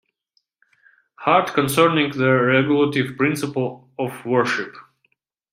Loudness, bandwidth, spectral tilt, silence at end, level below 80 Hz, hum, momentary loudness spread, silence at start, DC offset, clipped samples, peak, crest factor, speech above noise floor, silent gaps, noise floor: -19 LUFS; 16 kHz; -5.5 dB/octave; 0.7 s; -62 dBFS; none; 11 LU; 1.2 s; under 0.1%; under 0.1%; -2 dBFS; 20 dB; 51 dB; none; -70 dBFS